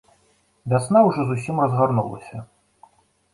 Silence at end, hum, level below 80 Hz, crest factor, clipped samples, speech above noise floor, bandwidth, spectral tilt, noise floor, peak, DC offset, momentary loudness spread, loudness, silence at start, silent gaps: 0.9 s; none; -58 dBFS; 18 dB; under 0.1%; 42 dB; 11.5 kHz; -8 dB/octave; -62 dBFS; -4 dBFS; under 0.1%; 21 LU; -20 LUFS; 0.65 s; none